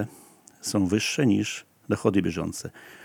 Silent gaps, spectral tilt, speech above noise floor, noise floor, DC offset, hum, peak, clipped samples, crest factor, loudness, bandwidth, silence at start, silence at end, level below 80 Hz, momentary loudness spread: none; -5 dB/octave; 27 dB; -53 dBFS; under 0.1%; none; -6 dBFS; under 0.1%; 20 dB; -26 LUFS; 19.5 kHz; 0 s; 0 s; -62 dBFS; 14 LU